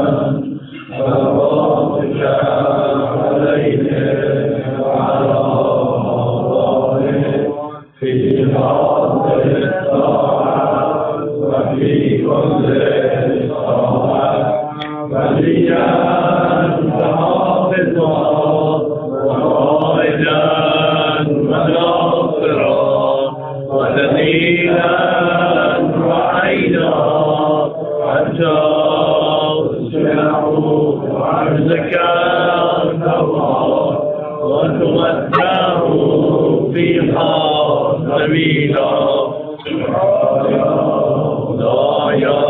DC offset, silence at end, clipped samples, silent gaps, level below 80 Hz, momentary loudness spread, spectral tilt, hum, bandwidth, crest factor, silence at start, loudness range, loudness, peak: under 0.1%; 0 s; under 0.1%; none; -48 dBFS; 5 LU; -10.5 dB/octave; none; 4.1 kHz; 14 dB; 0 s; 2 LU; -14 LUFS; 0 dBFS